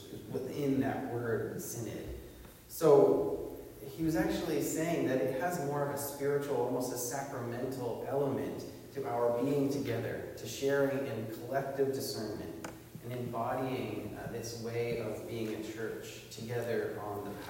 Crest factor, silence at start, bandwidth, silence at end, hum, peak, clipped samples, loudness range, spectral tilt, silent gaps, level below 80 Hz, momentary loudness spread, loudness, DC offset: 22 dB; 0 s; 16 kHz; 0 s; none; -12 dBFS; under 0.1%; 7 LU; -5.5 dB/octave; none; -60 dBFS; 12 LU; -35 LUFS; under 0.1%